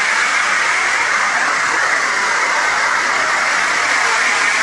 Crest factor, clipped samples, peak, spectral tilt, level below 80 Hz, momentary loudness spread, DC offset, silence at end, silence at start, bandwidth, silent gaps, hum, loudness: 14 dB; under 0.1%; -2 dBFS; 0.5 dB/octave; -54 dBFS; 1 LU; under 0.1%; 0 s; 0 s; 11.5 kHz; none; none; -14 LUFS